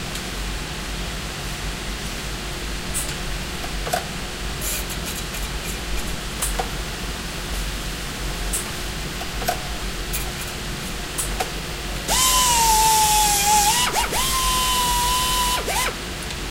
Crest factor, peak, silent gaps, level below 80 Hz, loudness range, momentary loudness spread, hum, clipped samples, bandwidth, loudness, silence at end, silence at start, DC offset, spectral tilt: 18 dB; -4 dBFS; none; -32 dBFS; 10 LU; 13 LU; none; under 0.1%; 16 kHz; -22 LUFS; 0 s; 0 s; under 0.1%; -1.5 dB/octave